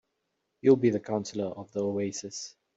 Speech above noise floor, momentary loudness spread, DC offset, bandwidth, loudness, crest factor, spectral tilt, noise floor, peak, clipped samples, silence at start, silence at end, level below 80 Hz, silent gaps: 52 dB; 14 LU; under 0.1%; 8 kHz; -28 LUFS; 20 dB; -6 dB/octave; -80 dBFS; -10 dBFS; under 0.1%; 0.65 s; 0.3 s; -72 dBFS; none